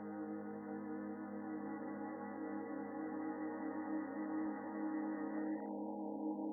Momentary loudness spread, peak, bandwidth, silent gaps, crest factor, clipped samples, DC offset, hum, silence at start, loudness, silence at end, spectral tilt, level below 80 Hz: 4 LU; -32 dBFS; 2.2 kHz; none; 12 dB; under 0.1%; under 0.1%; none; 0 s; -44 LUFS; 0 s; -11 dB/octave; -88 dBFS